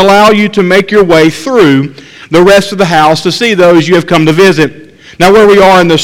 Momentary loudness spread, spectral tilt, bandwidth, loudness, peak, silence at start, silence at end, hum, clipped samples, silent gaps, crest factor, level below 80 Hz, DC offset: 6 LU; -5 dB/octave; 16.5 kHz; -6 LUFS; 0 dBFS; 0 s; 0 s; none; 6%; none; 6 dB; -36 dBFS; under 0.1%